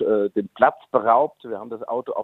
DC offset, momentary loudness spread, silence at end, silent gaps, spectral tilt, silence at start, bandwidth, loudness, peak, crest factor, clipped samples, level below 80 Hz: under 0.1%; 13 LU; 0 s; none; -8.5 dB/octave; 0 s; 4.1 kHz; -21 LUFS; -2 dBFS; 20 dB; under 0.1%; -68 dBFS